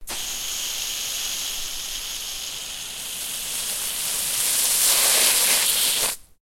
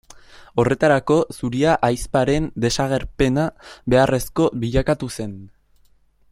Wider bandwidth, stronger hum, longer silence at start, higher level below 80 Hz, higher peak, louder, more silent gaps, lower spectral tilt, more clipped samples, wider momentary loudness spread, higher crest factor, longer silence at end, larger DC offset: about the same, 16.5 kHz vs 16 kHz; neither; second, 0 s vs 0.55 s; second, -50 dBFS vs -38 dBFS; about the same, -4 dBFS vs -2 dBFS; about the same, -21 LUFS vs -20 LUFS; neither; second, 2 dB/octave vs -6 dB/octave; neither; first, 13 LU vs 10 LU; about the same, 20 dB vs 18 dB; second, 0.2 s vs 0.85 s; neither